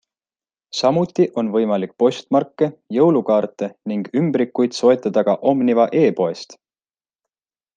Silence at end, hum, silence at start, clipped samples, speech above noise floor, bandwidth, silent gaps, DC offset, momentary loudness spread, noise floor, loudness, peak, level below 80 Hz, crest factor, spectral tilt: 1.25 s; none; 0.75 s; under 0.1%; over 72 dB; 9.2 kHz; none; under 0.1%; 9 LU; under -90 dBFS; -18 LUFS; -2 dBFS; -68 dBFS; 16 dB; -6.5 dB/octave